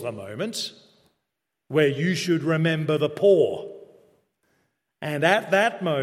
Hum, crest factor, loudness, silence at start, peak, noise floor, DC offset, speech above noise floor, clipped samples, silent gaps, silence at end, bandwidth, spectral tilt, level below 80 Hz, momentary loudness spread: none; 22 dB; -23 LUFS; 0 s; -2 dBFS; -82 dBFS; under 0.1%; 59 dB; under 0.1%; none; 0 s; 15 kHz; -5.5 dB/octave; -70 dBFS; 14 LU